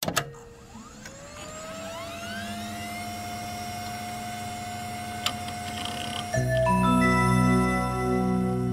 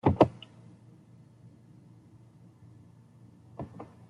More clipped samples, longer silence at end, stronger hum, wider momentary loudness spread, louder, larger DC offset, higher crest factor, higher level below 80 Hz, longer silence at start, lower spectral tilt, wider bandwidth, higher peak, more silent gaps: neither; second, 0 s vs 0.25 s; neither; second, 20 LU vs 30 LU; first, -27 LUFS vs -30 LUFS; neither; second, 18 dB vs 30 dB; first, -44 dBFS vs -60 dBFS; about the same, 0 s vs 0.05 s; second, -5 dB/octave vs -9 dB/octave; first, 16 kHz vs 11 kHz; second, -10 dBFS vs -4 dBFS; neither